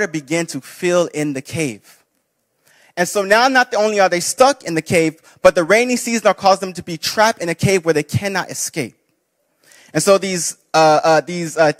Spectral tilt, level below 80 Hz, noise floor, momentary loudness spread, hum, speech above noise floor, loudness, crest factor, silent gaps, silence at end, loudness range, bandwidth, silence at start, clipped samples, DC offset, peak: -4 dB/octave; -56 dBFS; -68 dBFS; 10 LU; none; 52 dB; -16 LUFS; 16 dB; none; 0.05 s; 5 LU; 16 kHz; 0 s; under 0.1%; under 0.1%; 0 dBFS